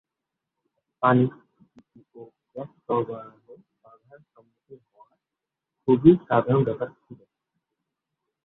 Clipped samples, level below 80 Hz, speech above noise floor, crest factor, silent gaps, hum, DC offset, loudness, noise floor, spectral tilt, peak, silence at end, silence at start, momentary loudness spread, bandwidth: under 0.1%; -64 dBFS; 65 dB; 24 dB; none; none; under 0.1%; -22 LUFS; -87 dBFS; -11.5 dB/octave; -4 dBFS; 1.3 s; 1 s; 22 LU; 4 kHz